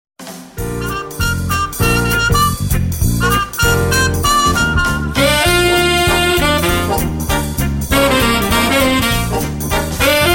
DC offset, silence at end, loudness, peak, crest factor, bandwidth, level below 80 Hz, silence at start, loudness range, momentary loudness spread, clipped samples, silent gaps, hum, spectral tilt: under 0.1%; 0 s; -14 LUFS; -2 dBFS; 12 dB; 17 kHz; -24 dBFS; 0.2 s; 3 LU; 7 LU; under 0.1%; none; none; -4 dB/octave